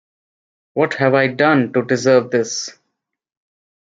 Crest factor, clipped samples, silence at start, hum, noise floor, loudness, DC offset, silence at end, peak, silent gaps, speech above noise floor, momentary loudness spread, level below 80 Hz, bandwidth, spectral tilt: 16 dB; under 0.1%; 0.75 s; none; -77 dBFS; -16 LUFS; under 0.1%; 1.15 s; -2 dBFS; none; 61 dB; 10 LU; -66 dBFS; 7.8 kHz; -5 dB/octave